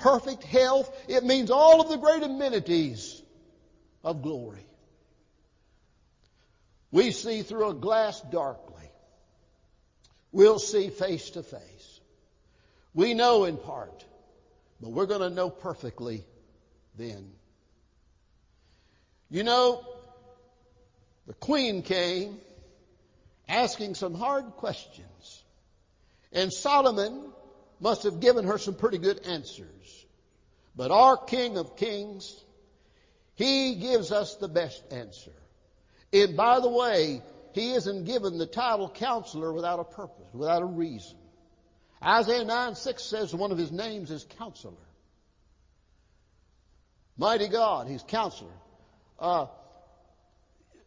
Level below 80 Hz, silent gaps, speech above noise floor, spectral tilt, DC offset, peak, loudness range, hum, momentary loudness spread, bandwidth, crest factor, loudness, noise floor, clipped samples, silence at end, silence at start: -62 dBFS; none; 39 dB; -4.5 dB/octave; under 0.1%; -6 dBFS; 9 LU; none; 20 LU; 7.6 kHz; 22 dB; -26 LUFS; -66 dBFS; under 0.1%; 1.35 s; 0 s